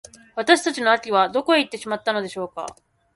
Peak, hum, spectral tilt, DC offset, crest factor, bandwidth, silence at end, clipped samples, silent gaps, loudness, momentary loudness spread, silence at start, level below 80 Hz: -2 dBFS; none; -3 dB/octave; under 0.1%; 20 dB; 11.5 kHz; 0.45 s; under 0.1%; none; -21 LUFS; 14 LU; 0.35 s; -66 dBFS